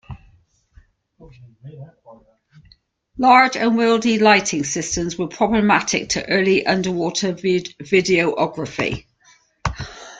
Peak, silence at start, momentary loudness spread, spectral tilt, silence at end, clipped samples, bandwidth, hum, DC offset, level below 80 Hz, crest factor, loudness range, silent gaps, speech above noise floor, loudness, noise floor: -2 dBFS; 0.1 s; 14 LU; -4 dB/octave; 0 s; under 0.1%; 9.4 kHz; none; under 0.1%; -46 dBFS; 18 dB; 5 LU; none; 37 dB; -18 LUFS; -56 dBFS